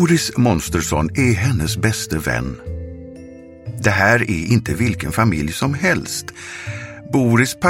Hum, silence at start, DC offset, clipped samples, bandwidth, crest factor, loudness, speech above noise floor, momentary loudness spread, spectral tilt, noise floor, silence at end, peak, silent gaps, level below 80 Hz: none; 0 s; under 0.1%; under 0.1%; 16.5 kHz; 18 dB; -18 LUFS; 20 dB; 16 LU; -5 dB/octave; -38 dBFS; 0 s; 0 dBFS; none; -36 dBFS